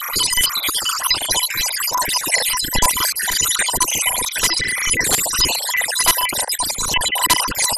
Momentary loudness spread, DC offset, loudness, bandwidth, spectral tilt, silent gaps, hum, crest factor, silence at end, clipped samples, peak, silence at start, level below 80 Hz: 3 LU; under 0.1%; -16 LUFS; 16 kHz; 0.5 dB/octave; none; none; 20 dB; 0 s; under 0.1%; 0 dBFS; 0 s; -38 dBFS